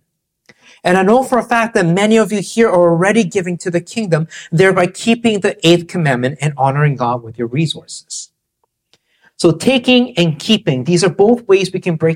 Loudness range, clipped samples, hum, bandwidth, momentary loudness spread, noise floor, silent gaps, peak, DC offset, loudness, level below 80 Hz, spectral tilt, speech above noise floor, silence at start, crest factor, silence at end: 5 LU; under 0.1%; none; 15.5 kHz; 8 LU; -68 dBFS; none; 0 dBFS; under 0.1%; -14 LUFS; -52 dBFS; -5.5 dB/octave; 55 dB; 0.85 s; 14 dB; 0 s